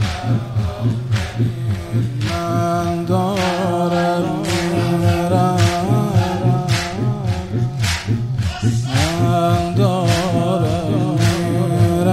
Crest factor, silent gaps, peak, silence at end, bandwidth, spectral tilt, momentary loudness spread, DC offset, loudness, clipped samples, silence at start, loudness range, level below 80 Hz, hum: 16 dB; none; -2 dBFS; 0 s; 15 kHz; -6.5 dB/octave; 5 LU; under 0.1%; -18 LUFS; under 0.1%; 0 s; 2 LU; -38 dBFS; none